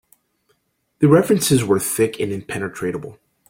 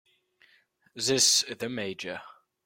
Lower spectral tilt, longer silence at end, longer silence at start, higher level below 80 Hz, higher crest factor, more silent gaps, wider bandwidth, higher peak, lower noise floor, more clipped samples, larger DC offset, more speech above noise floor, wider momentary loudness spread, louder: first, -5.5 dB/octave vs -1 dB/octave; about the same, 0.35 s vs 0.35 s; about the same, 1 s vs 0.95 s; first, -54 dBFS vs -72 dBFS; about the same, 18 dB vs 22 dB; neither; about the same, 16.5 kHz vs 16.5 kHz; first, -2 dBFS vs -10 dBFS; about the same, -67 dBFS vs -65 dBFS; neither; neither; first, 49 dB vs 37 dB; second, 12 LU vs 17 LU; first, -18 LUFS vs -25 LUFS